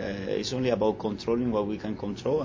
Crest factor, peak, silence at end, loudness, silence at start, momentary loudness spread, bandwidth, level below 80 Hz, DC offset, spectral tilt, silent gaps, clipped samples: 18 dB; -10 dBFS; 0 s; -29 LUFS; 0 s; 6 LU; 7.6 kHz; -52 dBFS; under 0.1%; -6 dB/octave; none; under 0.1%